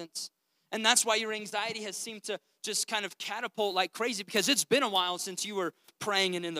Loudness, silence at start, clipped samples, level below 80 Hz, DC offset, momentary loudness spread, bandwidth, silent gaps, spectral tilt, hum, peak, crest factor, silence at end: -30 LUFS; 0 s; under 0.1%; under -90 dBFS; under 0.1%; 14 LU; 16 kHz; none; -1 dB/octave; none; -8 dBFS; 24 dB; 0 s